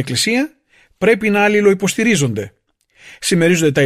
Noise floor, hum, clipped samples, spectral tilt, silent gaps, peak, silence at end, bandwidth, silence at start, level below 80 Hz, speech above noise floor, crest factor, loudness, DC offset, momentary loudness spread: -51 dBFS; none; under 0.1%; -4.5 dB/octave; none; -2 dBFS; 0 s; 15 kHz; 0 s; -52 dBFS; 36 dB; 14 dB; -15 LUFS; under 0.1%; 11 LU